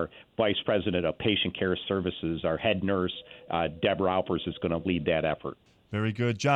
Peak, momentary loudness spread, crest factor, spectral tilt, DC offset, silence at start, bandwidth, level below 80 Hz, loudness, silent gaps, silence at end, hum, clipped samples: -10 dBFS; 7 LU; 18 dB; -6 dB/octave; under 0.1%; 0 s; 9 kHz; -54 dBFS; -29 LUFS; none; 0 s; none; under 0.1%